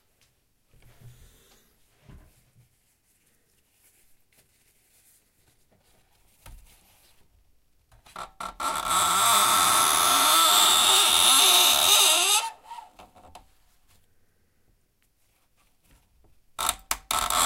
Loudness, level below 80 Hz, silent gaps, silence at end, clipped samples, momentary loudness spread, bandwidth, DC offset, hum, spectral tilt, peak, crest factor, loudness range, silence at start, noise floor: -19 LUFS; -56 dBFS; none; 0 s; under 0.1%; 18 LU; 16 kHz; under 0.1%; none; 1.5 dB/octave; -6 dBFS; 22 dB; 18 LU; 1.05 s; -67 dBFS